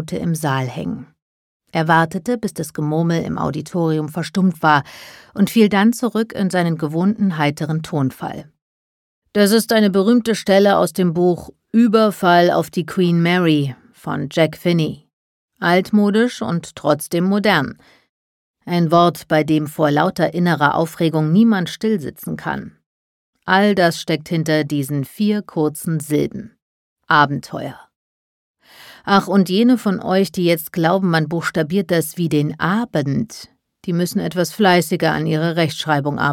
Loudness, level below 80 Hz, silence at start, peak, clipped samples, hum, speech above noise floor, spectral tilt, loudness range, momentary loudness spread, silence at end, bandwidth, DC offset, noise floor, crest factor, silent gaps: -17 LUFS; -56 dBFS; 0 s; 0 dBFS; under 0.1%; none; 27 dB; -6 dB/octave; 5 LU; 11 LU; 0 s; 17 kHz; under 0.1%; -44 dBFS; 18 dB; 1.22-1.60 s, 8.62-9.22 s, 15.13-15.48 s, 18.09-18.54 s, 22.86-23.33 s, 26.62-26.96 s, 27.96-28.54 s